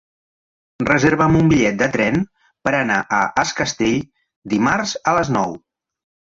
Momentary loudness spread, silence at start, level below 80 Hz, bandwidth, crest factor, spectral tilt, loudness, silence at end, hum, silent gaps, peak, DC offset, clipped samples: 11 LU; 0.8 s; -44 dBFS; 7.8 kHz; 16 dB; -5 dB/octave; -18 LUFS; 0.7 s; none; 4.36-4.42 s; -2 dBFS; under 0.1%; under 0.1%